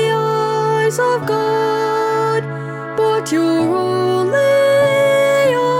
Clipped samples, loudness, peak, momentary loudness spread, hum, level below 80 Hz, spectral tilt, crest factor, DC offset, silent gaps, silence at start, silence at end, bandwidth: under 0.1%; -15 LUFS; -4 dBFS; 5 LU; none; -62 dBFS; -5.5 dB/octave; 10 dB; under 0.1%; none; 0 s; 0 s; 16.5 kHz